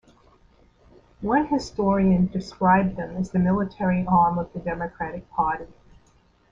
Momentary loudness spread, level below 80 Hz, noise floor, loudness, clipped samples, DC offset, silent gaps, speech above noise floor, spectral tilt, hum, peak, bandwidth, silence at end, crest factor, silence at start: 11 LU; -46 dBFS; -59 dBFS; -23 LUFS; under 0.1%; under 0.1%; none; 37 dB; -8 dB/octave; none; -6 dBFS; 7.6 kHz; 0.8 s; 18 dB; 1.2 s